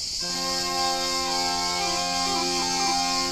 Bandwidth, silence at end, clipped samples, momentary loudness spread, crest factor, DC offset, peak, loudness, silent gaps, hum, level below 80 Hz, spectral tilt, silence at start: 15.5 kHz; 0 s; under 0.1%; 2 LU; 14 dB; under 0.1%; -12 dBFS; -24 LUFS; none; none; -48 dBFS; -1 dB/octave; 0 s